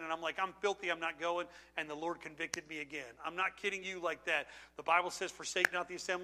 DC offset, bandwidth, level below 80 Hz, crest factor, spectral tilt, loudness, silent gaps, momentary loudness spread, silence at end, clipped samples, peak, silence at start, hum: under 0.1%; 15.5 kHz; -74 dBFS; 30 dB; -2 dB/octave; -37 LUFS; none; 10 LU; 0 s; under 0.1%; -8 dBFS; 0 s; none